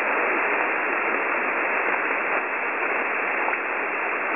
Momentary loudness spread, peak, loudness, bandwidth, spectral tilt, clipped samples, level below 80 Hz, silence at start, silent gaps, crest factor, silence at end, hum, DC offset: 3 LU; -10 dBFS; -23 LUFS; 3.7 kHz; -0.5 dB/octave; under 0.1%; -74 dBFS; 0 s; none; 14 dB; 0 s; none; 0.2%